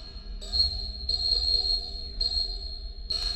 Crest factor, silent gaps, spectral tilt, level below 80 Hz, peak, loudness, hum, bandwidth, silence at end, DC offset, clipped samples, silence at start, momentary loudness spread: 18 dB; none; -2.5 dB/octave; -36 dBFS; -12 dBFS; -26 LUFS; none; 11.5 kHz; 0 s; under 0.1%; under 0.1%; 0 s; 16 LU